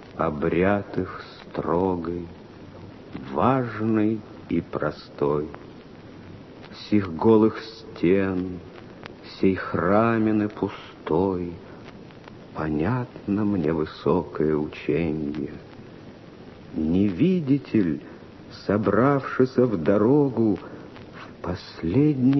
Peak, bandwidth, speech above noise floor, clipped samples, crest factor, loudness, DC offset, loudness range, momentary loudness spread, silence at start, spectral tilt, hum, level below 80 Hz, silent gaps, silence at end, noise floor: -4 dBFS; 6.2 kHz; 21 dB; under 0.1%; 20 dB; -24 LUFS; under 0.1%; 5 LU; 23 LU; 0 s; -9 dB/octave; none; -50 dBFS; none; 0 s; -44 dBFS